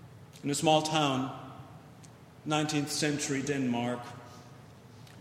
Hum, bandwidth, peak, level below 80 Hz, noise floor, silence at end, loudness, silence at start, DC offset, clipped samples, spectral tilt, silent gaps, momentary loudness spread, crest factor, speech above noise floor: none; 16 kHz; -10 dBFS; -70 dBFS; -52 dBFS; 0 s; -30 LUFS; 0 s; under 0.1%; under 0.1%; -4 dB/octave; none; 25 LU; 22 dB; 23 dB